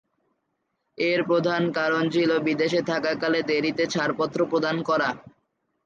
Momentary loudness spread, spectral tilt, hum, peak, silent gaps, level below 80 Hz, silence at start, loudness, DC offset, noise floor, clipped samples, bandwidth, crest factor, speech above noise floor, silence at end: 3 LU; -5.5 dB/octave; none; -10 dBFS; none; -68 dBFS; 1 s; -24 LUFS; under 0.1%; -76 dBFS; under 0.1%; 7.6 kHz; 14 dB; 53 dB; 0.55 s